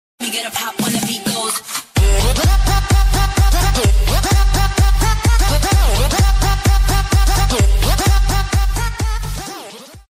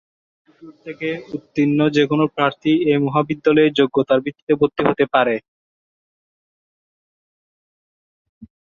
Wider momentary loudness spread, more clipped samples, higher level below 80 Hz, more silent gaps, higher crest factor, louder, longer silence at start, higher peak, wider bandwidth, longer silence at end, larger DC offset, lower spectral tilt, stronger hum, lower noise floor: second, 7 LU vs 11 LU; neither; first, -16 dBFS vs -60 dBFS; second, none vs 4.42-4.47 s, 5.48-8.41 s; second, 10 dB vs 18 dB; about the same, -16 LUFS vs -18 LUFS; second, 0.2 s vs 0.65 s; about the same, -4 dBFS vs -2 dBFS; first, 16 kHz vs 7.2 kHz; about the same, 0.15 s vs 0.2 s; neither; second, -4 dB/octave vs -7.5 dB/octave; neither; second, -35 dBFS vs under -90 dBFS